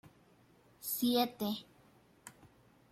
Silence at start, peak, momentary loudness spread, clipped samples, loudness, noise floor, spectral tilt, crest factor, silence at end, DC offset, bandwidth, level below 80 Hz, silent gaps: 0.8 s; -18 dBFS; 24 LU; under 0.1%; -35 LUFS; -66 dBFS; -3.5 dB/octave; 22 dB; 0.45 s; under 0.1%; 16 kHz; -76 dBFS; none